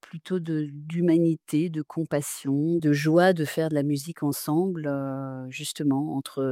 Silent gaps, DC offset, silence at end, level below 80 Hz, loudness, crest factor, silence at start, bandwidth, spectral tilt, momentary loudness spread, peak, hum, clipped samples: none; under 0.1%; 0 s; -72 dBFS; -26 LUFS; 18 dB; 0.15 s; 16.5 kHz; -6 dB/octave; 10 LU; -8 dBFS; none; under 0.1%